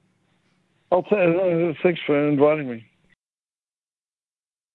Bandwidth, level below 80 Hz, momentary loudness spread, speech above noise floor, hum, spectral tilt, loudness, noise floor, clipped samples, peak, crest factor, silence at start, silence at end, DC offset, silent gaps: 4.3 kHz; -68 dBFS; 7 LU; over 70 dB; none; -10 dB/octave; -21 LUFS; under -90 dBFS; under 0.1%; -4 dBFS; 18 dB; 0.9 s; 1.95 s; under 0.1%; none